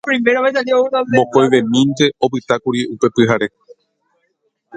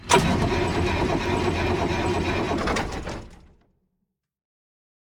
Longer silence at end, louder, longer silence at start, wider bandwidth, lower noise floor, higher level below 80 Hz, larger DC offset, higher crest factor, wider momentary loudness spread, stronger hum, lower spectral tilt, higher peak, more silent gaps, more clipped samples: second, 0 s vs 1.75 s; first, -15 LUFS vs -24 LUFS; about the same, 0.05 s vs 0 s; second, 9.2 kHz vs over 20 kHz; second, -67 dBFS vs -78 dBFS; second, -56 dBFS vs -38 dBFS; neither; second, 16 dB vs 22 dB; second, 6 LU vs 10 LU; neither; about the same, -5.5 dB/octave vs -5 dB/octave; first, 0 dBFS vs -4 dBFS; neither; neither